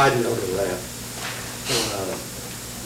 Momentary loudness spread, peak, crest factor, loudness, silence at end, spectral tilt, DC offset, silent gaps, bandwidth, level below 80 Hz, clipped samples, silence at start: 9 LU; -8 dBFS; 16 dB; -26 LUFS; 0 s; -3.5 dB/octave; under 0.1%; none; over 20 kHz; -48 dBFS; under 0.1%; 0 s